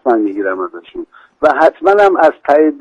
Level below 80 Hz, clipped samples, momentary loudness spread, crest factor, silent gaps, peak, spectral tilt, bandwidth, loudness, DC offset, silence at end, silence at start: -54 dBFS; under 0.1%; 18 LU; 12 dB; none; 0 dBFS; -5.5 dB/octave; 8.6 kHz; -12 LUFS; under 0.1%; 0 s; 0.05 s